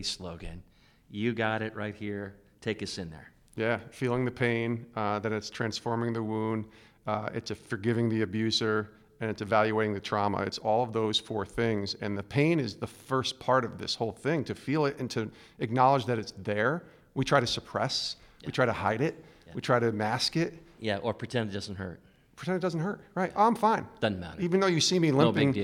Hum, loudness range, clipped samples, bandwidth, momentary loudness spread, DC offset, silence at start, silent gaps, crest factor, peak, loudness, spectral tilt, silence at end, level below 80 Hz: none; 4 LU; under 0.1%; 15.5 kHz; 13 LU; under 0.1%; 0 s; none; 20 dB; -10 dBFS; -30 LUFS; -5 dB/octave; 0 s; -60 dBFS